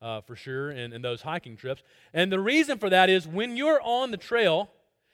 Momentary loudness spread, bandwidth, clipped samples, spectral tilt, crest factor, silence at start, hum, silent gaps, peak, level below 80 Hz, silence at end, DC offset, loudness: 16 LU; 16.5 kHz; under 0.1%; -5 dB/octave; 20 dB; 0 s; none; none; -6 dBFS; -68 dBFS; 0.5 s; under 0.1%; -25 LUFS